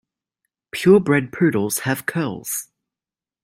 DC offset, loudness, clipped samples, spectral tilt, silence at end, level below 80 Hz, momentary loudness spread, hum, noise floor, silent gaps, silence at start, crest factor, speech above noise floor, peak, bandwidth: under 0.1%; -19 LUFS; under 0.1%; -5.5 dB/octave; 0.8 s; -60 dBFS; 12 LU; none; under -90 dBFS; none; 0.75 s; 18 dB; over 71 dB; -2 dBFS; 16.5 kHz